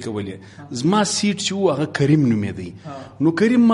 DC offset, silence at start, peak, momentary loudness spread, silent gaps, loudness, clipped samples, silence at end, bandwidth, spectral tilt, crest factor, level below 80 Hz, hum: under 0.1%; 0 s; -4 dBFS; 17 LU; none; -19 LUFS; under 0.1%; 0 s; 11.5 kHz; -5.5 dB/octave; 16 dB; -56 dBFS; none